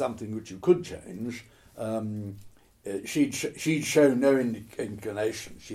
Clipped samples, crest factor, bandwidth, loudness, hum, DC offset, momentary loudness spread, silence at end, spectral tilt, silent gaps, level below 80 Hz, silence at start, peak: under 0.1%; 18 dB; 16 kHz; -28 LUFS; none; under 0.1%; 17 LU; 0 s; -5 dB/octave; none; -60 dBFS; 0 s; -10 dBFS